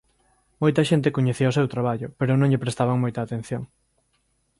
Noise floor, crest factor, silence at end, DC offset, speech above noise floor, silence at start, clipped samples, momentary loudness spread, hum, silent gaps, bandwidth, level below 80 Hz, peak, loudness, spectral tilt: -69 dBFS; 16 dB; 0.95 s; under 0.1%; 47 dB; 0.6 s; under 0.1%; 10 LU; none; none; 11.5 kHz; -58 dBFS; -6 dBFS; -23 LUFS; -7 dB/octave